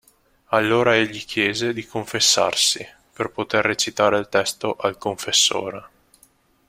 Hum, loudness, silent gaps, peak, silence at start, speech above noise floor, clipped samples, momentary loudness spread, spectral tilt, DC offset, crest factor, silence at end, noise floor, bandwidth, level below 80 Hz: none; -20 LUFS; none; -2 dBFS; 0.5 s; 37 dB; under 0.1%; 11 LU; -2 dB/octave; under 0.1%; 20 dB; 0.8 s; -58 dBFS; 16.5 kHz; -58 dBFS